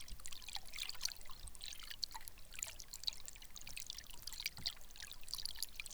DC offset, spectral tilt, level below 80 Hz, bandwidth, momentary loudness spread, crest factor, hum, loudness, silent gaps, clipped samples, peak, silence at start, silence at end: under 0.1%; 0.5 dB/octave; -58 dBFS; over 20 kHz; 9 LU; 26 dB; none; -46 LUFS; none; under 0.1%; -20 dBFS; 0 s; 0 s